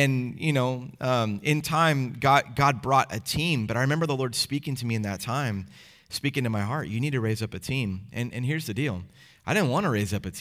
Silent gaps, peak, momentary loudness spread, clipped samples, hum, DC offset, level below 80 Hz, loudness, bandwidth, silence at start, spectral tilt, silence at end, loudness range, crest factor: none; -6 dBFS; 9 LU; under 0.1%; none; under 0.1%; -56 dBFS; -26 LUFS; 16 kHz; 0 s; -5.5 dB/octave; 0 s; 5 LU; 20 dB